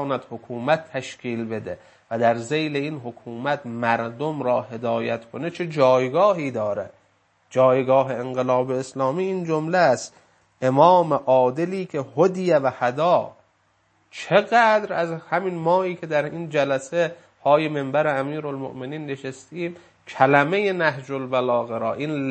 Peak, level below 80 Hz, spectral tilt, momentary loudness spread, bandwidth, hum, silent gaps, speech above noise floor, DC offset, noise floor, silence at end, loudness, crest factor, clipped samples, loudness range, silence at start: 0 dBFS; -70 dBFS; -6 dB/octave; 14 LU; 8.8 kHz; none; none; 43 dB; under 0.1%; -64 dBFS; 0 s; -22 LUFS; 22 dB; under 0.1%; 5 LU; 0 s